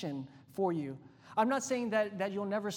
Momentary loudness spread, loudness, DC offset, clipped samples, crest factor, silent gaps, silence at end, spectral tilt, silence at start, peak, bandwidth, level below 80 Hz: 13 LU; -34 LUFS; under 0.1%; under 0.1%; 18 dB; none; 0 s; -5 dB/octave; 0 s; -16 dBFS; 18 kHz; -80 dBFS